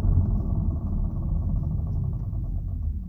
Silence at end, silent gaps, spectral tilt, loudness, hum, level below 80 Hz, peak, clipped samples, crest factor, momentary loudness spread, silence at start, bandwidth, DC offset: 0 s; none; -13 dB/octave; -28 LUFS; none; -28 dBFS; -10 dBFS; under 0.1%; 14 dB; 6 LU; 0 s; 1.5 kHz; under 0.1%